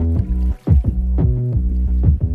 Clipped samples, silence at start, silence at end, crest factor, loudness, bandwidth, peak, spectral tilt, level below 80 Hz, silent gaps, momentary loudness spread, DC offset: under 0.1%; 0 s; 0 s; 14 dB; -18 LUFS; 2.1 kHz; -2 dBFS; -12 dB/octave; -18 dBFS; none; 3 LU; under 0.1%